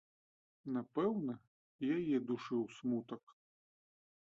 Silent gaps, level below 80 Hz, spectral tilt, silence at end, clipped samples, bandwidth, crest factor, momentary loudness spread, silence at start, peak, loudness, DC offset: 1.47-1.79 s, 3.23-3.27 s; -82 dBFS; -6.5 dB/octave; 1.05 s; under 0.1%; 7.6 kHz; 16 dB; 14 LU; 0.65 s; -24 dBFS; -39 LUFS; under 0.1%